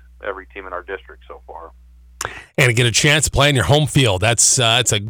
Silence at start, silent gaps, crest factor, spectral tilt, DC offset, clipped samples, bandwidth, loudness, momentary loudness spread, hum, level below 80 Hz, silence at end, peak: 0.2 s; none; 14 dB; -3 dB/octave; under 0.1%; under 0.1%; over 20 kHz; -14 LUFS; 18 LU; none; -38 dBFS; 0 s; -4 dBFS